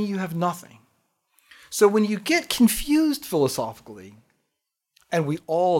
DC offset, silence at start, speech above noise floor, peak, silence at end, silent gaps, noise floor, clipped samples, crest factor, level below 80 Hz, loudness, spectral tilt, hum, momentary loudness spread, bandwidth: under 0.1%; 0 s; 58 dB; -4 dBFS; 0 s; none; -81 dBFS; under 0.1%; 20 dB; -50 dBFS; -23 LUFS; -4.5 dB/octave; none; 16 LU; 17 kHz